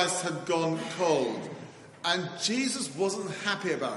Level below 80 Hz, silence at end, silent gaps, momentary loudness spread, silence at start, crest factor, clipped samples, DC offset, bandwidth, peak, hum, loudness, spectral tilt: -76 dBFS; 0 s; none; 9 LU; 0 s; 22 dB; under 0.1%; under 0.1%; 11.5 kHz; -8 dBFS; none; -29 LUFS; -3.5 dB/octave